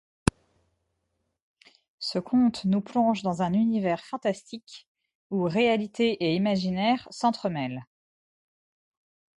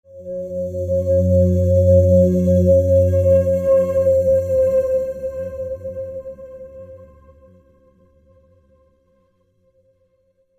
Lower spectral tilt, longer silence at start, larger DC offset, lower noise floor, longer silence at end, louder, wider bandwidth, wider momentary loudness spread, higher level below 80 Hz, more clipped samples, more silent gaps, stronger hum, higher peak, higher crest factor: second, -6 dB/octave vs -10.5 dB/octave; first, 2 s vs 0.15 s; neither; first, -78 dBFS vs -63 dBFS; second, 1.55 s vs 3.55 s; second, -27 LUFS vs -17 LUFS; second, 11.5 kHz vs 14 kHz; second, 9 LU vs 18 LU; second, -52 dBFS vs -46 dBFS; neither; first, 4.87-4.95 s, 5.15-5.30 s vs none; neither; about the same, -2 dBFS vs -4 dBFS; first, 26 dB vs 16 dB